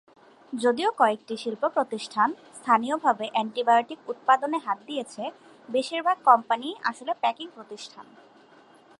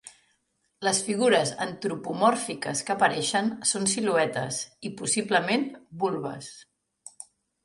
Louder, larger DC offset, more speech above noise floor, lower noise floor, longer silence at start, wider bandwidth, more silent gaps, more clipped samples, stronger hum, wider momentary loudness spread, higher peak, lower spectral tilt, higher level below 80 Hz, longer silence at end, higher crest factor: about the same, -25 LUFS vs -26 LUFS; neither; second, 29 dB vs 47 dB; second, -55 dBFS vs -73 dBFS; first, 0.5 s vs 0.05 s; about the same, 11.5 kHz vs 11.5 kHz; neither; neither; neither; about the same, 15 LU vs 13 LU; first, -4 dBFS vs -8 dBFS; about the same, -3.5 dB/octave vs -3 dB/octave; second, -82 dBFS vs -70 dBFS; first, 0.95 s vs 0.4 s; about the same, 24 dB vs 20 dB